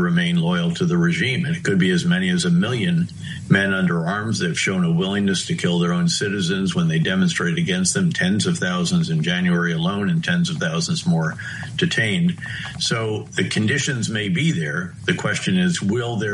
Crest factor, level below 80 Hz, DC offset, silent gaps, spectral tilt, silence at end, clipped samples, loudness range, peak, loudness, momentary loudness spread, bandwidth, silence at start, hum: 18 dB; -54 dBFS; under 0.1%; none; -5 dB/octave; 0 s; under 0.1%; 2 LU; -2 dBFS; -20 LUFS; 5 LU; 11.5 kHz; 0 s; none